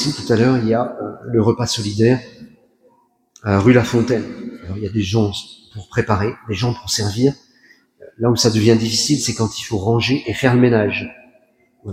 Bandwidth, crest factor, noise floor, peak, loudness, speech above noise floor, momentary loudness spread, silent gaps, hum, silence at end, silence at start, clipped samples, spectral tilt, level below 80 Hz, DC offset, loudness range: 15.5 kHz; 18 dB; -57 dBFS; 0 dBFS; -17 LUFS; 41 dB; 15 LU; none; none; 0 s; 0 s; under 0.1%; -5.5 dB/octave; -48 dBFS; under 0.1%; 4 LU